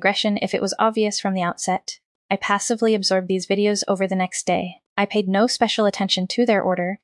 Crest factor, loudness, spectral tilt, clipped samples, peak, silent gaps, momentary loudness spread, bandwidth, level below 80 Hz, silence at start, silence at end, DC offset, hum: 16 dB; -21 LUFS; -4 dB/octave; under 0.1%; -4 dBFS; 2.05-2.29 s, 4.86-4.96 s; 6 LU; 12 kHz; -68 dBFS; 0 s; 0.1 s; under 0.1%; none